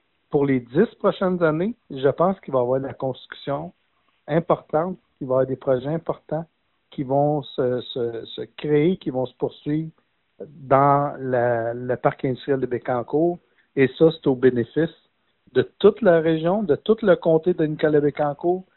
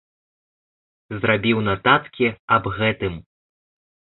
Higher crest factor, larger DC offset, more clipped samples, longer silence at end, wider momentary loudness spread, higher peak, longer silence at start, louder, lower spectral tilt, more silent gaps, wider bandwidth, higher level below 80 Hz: about the same, 20 dB vs 22 dB; neither; neither; second, 0.15 s vs 0.95 s; about the same, 12 LU vs 11 LU; about the same, -2 dBFS vs -2 dBFS; second, 0.3 s vs 1.1 s; about the same, -22 LUFS vs -20 LUFS; second, -6.5 dB/octave vs -10.5 dB/octave; second, none vs 2.39-2.48 s; about the same, 4.2 kHz vs 4.3 kHz; second, -58 dBFS vs -48 dBFS